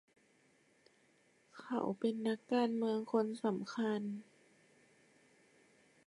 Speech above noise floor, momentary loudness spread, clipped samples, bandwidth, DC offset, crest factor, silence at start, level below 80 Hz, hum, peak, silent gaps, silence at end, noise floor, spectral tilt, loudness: 35 dB; 8 LU; under 0.1%; 11.5 kHz; under 0.1%; 20 dB; 1.55 s; -88 dBFS; none; -20 dBFS; none; 1.85 s; -72 dBFS; -6.5 dB/octave; -37 LUFS